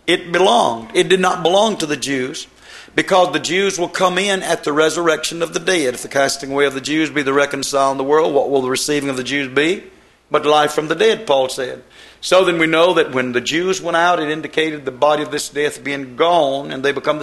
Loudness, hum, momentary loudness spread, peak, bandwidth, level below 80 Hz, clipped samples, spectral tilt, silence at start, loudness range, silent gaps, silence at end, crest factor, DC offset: -16 LUFS; none; 7 LU; 0 dBFS; 13 kHz; -56 dBFS; under 0.1%; -3.5 dB/octave; 0.05 s; 2 LU; none; 0 s; 16 dB; under 0.1%